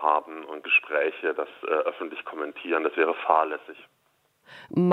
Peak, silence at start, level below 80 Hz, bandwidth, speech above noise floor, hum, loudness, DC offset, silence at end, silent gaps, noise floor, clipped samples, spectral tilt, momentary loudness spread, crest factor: -4 dBFS; 0 s; -80 dBFS; 5.6 kHz; 42 dB; none; -26 LUFS; under 0.1%; 0 s; none; -69 dBFS; under 0.1%; -8 dB/octave; 13 LU; 22 dB